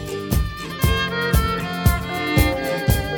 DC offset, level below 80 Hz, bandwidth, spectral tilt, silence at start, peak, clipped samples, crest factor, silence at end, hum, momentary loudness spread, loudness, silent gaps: under 0.1%; -26 dBFS; over 20 kHz; -5 dB/octave; 0 s; -4 dBFS; under 0.1%; 16 dB; 0 s; none; 5 LU; -21 LUFS; none